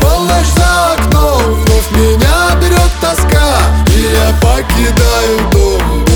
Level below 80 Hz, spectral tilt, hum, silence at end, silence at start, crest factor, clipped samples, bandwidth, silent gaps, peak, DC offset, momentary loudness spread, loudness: -12 dBFS; -5 dB/octave; none; 0 s; 0 s; 8 dB; under 0.1%; over 20 kHz; none; 0 dBFS; under 0.1%; 2 LU; -10 LUFS